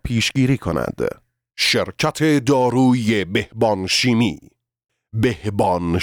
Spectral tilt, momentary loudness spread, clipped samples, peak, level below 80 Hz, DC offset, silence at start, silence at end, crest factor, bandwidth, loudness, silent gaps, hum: -5 dB/octave; 8 LU; under 0.1%; -6 dBFS; -44 dBFS; under 0.1%; 0.05 s; 0 s; 14 dB; 19 kHz; -19 LUFS; none; none